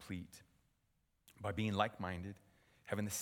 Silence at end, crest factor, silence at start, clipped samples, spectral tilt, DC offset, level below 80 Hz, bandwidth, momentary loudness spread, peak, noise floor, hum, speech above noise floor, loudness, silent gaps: 0 s; 24 dB; 0 s; under 0.1%; -4.5 dB/octave; under 0.1%; -68 dBFS; 18.5 kHz; 23 LU; -18 dBFS; -80 dBFS; none; 39 dB; -42 LUFS; none